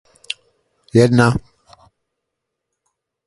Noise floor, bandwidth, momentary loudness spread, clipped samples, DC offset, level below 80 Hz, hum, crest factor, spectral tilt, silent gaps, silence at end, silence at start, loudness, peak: -78 dBFS; 11.5 kHz; 17 LU; under 0.1%; under 0.1%; -46 dBFS; none; 20 dB; -6.5 dB/octave; none; 1.85 s; 0.95 s; -15 LUFS; 0 dBFS